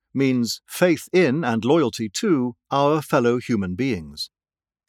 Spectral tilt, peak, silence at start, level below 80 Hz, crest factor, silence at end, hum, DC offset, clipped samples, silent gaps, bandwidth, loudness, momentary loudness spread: -5.5 dB/octave; -4 dBFS; 0.15 s; -58 dBFS; 18 dB; 0.65 s; none; under 0.1%; under 0.1%; none; 17 kHz; -21 LUFS; 7 LU